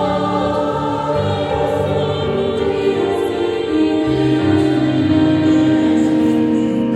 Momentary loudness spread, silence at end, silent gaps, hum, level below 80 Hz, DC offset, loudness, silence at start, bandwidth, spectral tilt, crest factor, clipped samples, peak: 5 LU; 0 s; none; none; -40 dBFS; under 0.1%; -16 LUFS; 0 s; 11 kHz; -7.5 dB/octave; 12 dB; under 0.1%; -2 dBFS